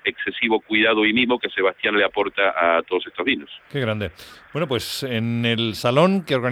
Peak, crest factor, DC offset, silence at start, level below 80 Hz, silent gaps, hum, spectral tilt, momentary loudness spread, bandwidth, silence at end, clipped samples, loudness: -2 dBFS; 18 dB; under 0.1%; 0.05 s; -58 dBFS; none; none; -5.5 dB/octave; 9 LU; 20 kHz; 0 s; under 0.1%; -21 LUFS